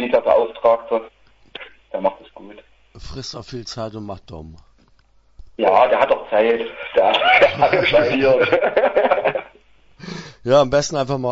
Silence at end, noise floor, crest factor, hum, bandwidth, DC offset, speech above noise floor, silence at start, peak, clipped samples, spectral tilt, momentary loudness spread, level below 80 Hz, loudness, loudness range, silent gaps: 0 s; -54 dBFS; 18 dB; none; 8 kHz; under 0.1%; 37 dB; 0 s; 0 dBFS; under 0.1%; -4.5 dB/octave; 19 LU; -48 dBFS; -17 LUFS; 14 LU; none